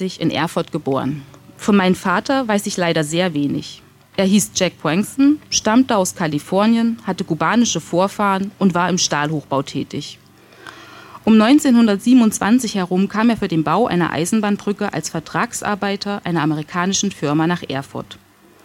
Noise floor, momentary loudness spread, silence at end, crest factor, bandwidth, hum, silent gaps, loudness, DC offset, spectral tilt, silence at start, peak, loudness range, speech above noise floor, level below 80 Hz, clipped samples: -41 dBFS; 11 LU; 0.5 s; 14 dB; 16.5 kHz; none; none; -18 LUFS; under 0.1%; -4.5 dB/octave; 0 s; -4 dBFS; 5 LU; 24 dB; -54 dBFS; under 0.1%